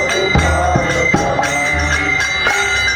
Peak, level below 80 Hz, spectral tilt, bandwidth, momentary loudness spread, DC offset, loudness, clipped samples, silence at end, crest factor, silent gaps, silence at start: 0 dBFS; -26 dBFS; -3.5 dB/octave; 19.5 kHz; 1 LU; under 0.1%; -14 LUFS; under 0.1%; 0 s; 14 dB; none; 0 s